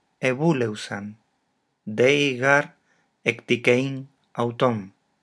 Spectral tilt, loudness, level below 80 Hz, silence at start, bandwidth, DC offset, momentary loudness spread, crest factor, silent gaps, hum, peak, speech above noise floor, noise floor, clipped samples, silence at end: -5.5 dB/octave; -23 LUFS; -78 dBFS; 0.2 s; 11 kHz; under 0.1%; 17 LU; 22 dB; none; none; -2 dBFS; 50 dB; -72 dBFS; under 0.1%; 0.35 s